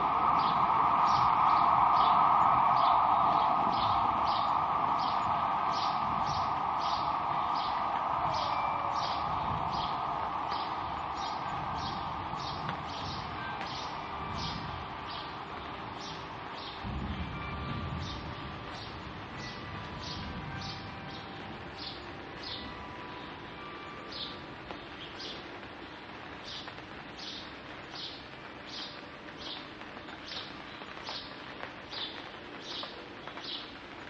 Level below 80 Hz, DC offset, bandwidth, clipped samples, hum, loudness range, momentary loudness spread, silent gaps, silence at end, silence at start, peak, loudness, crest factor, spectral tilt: -54 dBFS; under 0.1%; 8 kHz; under 0.1%; none; 16 LU; 18 LU; none; 0 s; 0 s; -14 dBFS; -32 LUFS; 20 dB; -5 dB/octave